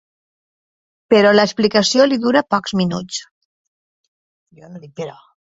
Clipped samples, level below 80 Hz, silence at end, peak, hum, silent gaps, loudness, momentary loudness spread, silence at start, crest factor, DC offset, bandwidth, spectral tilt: under 0.1%; -60 dBFS; 0.45 s; 0 dBFS; none; 3.31-4.46 s; -15 LUFS; 18 LU; 1.1 s; 18 dB; under 0.1%; 8 kHz; -4.5 dB/octave